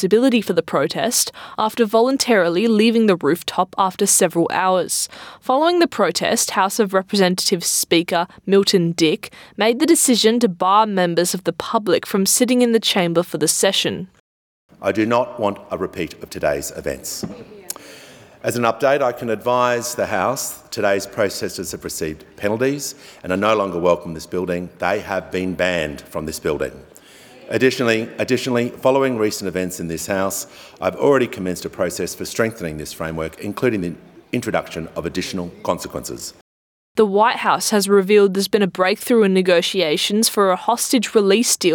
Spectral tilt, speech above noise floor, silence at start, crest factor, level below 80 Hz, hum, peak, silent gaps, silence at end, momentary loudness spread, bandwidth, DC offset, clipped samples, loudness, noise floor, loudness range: -3.5 dB/octave; 26 dB; 0 s; 16 dB; -54 dBFS; none; -2 dBFS; 14.20-14.69 s, 36.41-36.95 s; 0 s; 12 LU; 19.5 kHz; under 0.1%; under 0.1%; -18 LUFS; -45 dBFS; 7 LU